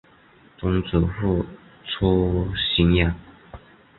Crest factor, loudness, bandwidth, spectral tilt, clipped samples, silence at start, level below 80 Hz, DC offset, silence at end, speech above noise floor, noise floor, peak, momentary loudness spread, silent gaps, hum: 20 dB; -22 LUFS; 4.3 kHz; -11.5 dB/octave; under 0.1%; 0.6 s; -34 dBFS; under 0.1%; 0.4 s; 32 dB; -53 dBFS; -4 dBFS; 14 LU; none; none